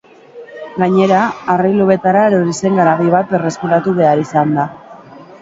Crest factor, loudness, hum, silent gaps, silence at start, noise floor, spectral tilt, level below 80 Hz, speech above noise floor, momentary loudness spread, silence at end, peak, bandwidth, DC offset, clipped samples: 14 dB; -13 LUFS; none; none; 0.35 s; -36 dBFS; -7 dB/octave; -56 dBFS; 24 dB; 7 LU; 0.2 s; 0 dBFS; 8 kHz; under 0.1%; under 0.1%